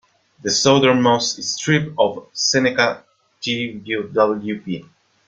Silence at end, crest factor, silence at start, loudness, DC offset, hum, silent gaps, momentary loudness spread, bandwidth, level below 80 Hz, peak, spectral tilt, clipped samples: 0.45 s; 18 dB; 0.45 s; -18 LUFS; under 0.1%; none; none; 14 LU; 9.4 kHz; -60 dBFS; -2 dBFS; -3.5 dB/octave; under 0.1%